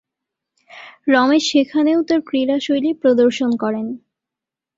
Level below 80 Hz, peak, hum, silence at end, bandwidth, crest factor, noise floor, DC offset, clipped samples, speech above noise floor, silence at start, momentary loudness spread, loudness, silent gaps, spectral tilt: -64 dBFS; -2 dBFS; none; 0.8 s; 7.8 kHz; 16 dB; -86 dBFS; under 0.1%; under 0.1%; 70 dB; 0.75 s; 11 LU; -17 LUFS; none; -4 dB/octave